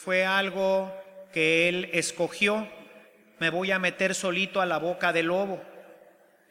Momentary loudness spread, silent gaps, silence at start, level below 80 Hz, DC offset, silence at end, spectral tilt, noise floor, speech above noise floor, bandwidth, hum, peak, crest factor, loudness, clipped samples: 10 LU; none; 0 s; -74 dBFS; under 0.1%; 0.55 s; -3.5 dB/octave; -57 dBFS; 31 dB; 16.5 kHz; none; -8 dBFS; 20 dB; -26 LUFS; under 0.1%